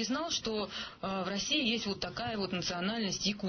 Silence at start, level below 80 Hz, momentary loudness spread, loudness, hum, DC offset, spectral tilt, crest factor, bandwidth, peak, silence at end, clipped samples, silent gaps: 0 s; -60 dBFS; 7 LU; -34 LUFS; none; under 0.1%; -3.5 dB/octave; 16 dB; 6.6 kHz; -20 dBFS; 0 s; under 0.1%; none